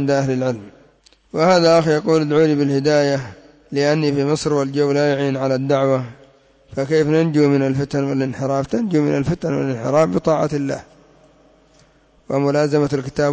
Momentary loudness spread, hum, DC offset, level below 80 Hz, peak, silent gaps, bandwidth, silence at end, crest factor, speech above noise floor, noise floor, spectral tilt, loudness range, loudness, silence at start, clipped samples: 9 LU; none; under 0.1%; -50 dBFS; -4 dBFS; none; 8 kHz; 0 s; 14 dB; 36 dB; -53 dBFS; -6.5 dB/octave; 4 LU; -18 LUFS; 0 s; under 0.1%